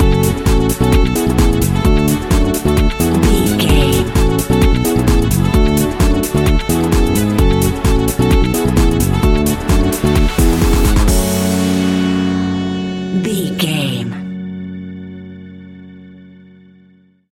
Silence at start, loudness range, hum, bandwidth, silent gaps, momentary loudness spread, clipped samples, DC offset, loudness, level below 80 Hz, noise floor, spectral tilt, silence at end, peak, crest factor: 0 s; 7 LU; none; 17 kHz; none; 10 LU; under 0.1%; under 0.1%; -14 LUFS; -18 dBFS; -49 dBFS; -5.5 dB/octave; 1.15 s; 0 dBFS; 14 dB